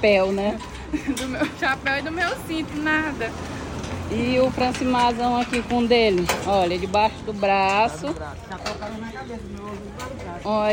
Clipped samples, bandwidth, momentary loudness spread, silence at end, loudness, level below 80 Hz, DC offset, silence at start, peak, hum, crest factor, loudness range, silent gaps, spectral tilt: under 0.1%; 17 kHz; 14 LU; 0 s; -23 LUFS; -42 dBFS; under 0.1%; 0 s; -6 dBFS; none; 18 dB; 4 LU; none; -5 dB/octave